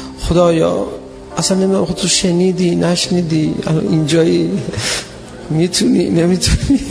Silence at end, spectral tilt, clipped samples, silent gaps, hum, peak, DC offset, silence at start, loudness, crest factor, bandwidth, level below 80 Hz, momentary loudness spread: 0 s; -5 dB/octave; under 0.1%; none; none; 0 dBFS; under 0.1%; 0 s; -14 LUFS; 14 dB; 11 kHz; -30 dBFS; 8 LU